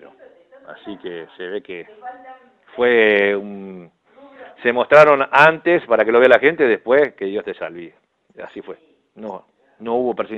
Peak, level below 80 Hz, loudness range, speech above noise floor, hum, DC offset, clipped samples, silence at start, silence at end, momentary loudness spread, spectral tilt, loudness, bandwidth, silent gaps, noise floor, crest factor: 0 dBFS; -62 dBFS; 9 LU; 30 dB; none; under 0.1%; under 0.1%; 0.7 s; 0 s; 24 LU; -6 dB/octave; -15 LUFS; 8.6 kHz; none; -47 dBFS; 18 dB